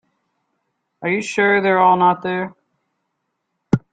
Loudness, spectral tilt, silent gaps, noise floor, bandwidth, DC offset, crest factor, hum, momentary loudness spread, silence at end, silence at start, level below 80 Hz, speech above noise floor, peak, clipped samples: -17 LUFS; -6 dB/octave; none; -74 dBFS; 9.2 kHz; under 0.1%; 18 dB; none; 12 LU; 0.15 s; 1 s; -56 dBFS; 58 dB; -2 dBFS; under 0.1%